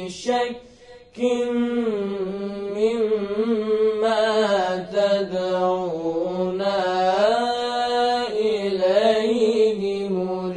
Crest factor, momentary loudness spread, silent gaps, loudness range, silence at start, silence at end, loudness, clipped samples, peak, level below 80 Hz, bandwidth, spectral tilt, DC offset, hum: 16 dB; 6 LU; none; 3 LU; 0 s; 0 s; -22 LUFS; under 0.1%; -6 dBFS; -60 dBFS; 10.5 kHz; -5 dB/octave; under 0.1%; none